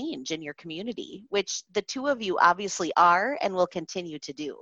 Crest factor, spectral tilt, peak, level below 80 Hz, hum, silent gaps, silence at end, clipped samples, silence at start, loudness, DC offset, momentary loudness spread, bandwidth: 22 dB; -3 dB/octave; -6 dBFS; -68 dBFS; none; none; 0.05 s; under 0.1%; 0 s; -26 LUFS; under 0.1%; 15 LU; 8.4 kHz